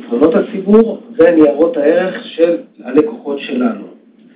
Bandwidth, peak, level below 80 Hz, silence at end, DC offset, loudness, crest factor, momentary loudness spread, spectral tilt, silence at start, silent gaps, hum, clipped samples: 4 kHz; 0 dBFS; -52 dBFS; 0.45 s; under 0.1%; -13 LUFS; 12 dB; 10 LU; -11 dB/octave; 0 s; none; none; under 0.1%